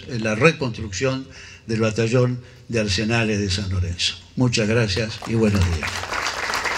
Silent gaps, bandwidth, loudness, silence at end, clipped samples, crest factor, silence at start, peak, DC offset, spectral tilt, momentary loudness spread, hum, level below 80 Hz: none; 15 kHz; -21 LUFS; 0 s; under 0.1%; 22 dB; 0 s; 0 dBFS; under 0.1%; -5 dB/octave; 8 LU; none; -44 dBFS